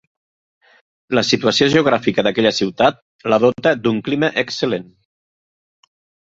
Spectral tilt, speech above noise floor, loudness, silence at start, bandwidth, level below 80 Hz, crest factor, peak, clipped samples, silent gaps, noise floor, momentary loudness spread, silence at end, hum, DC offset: -4.5 dB/octave; over 74 dB; -17 LUFS; 1.1 s; 7.8 kHz; -56 dBFS; 18 dB; 0 dBFS; under 0.1%; 3.02-3.19 s; under -90 dBFS; 7 LU; 1.5 s; none; under 0.1%